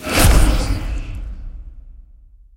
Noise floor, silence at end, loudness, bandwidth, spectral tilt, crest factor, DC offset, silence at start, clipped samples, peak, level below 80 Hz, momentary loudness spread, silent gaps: -45 dBFS; 0.55 s; -17 LUFS; 16.5 kHz; -4 dB/octave; 18 dB; under 0.1%; 0 s; under 0.1%; 0 dBFS; -20 dBFS; 23 LU; none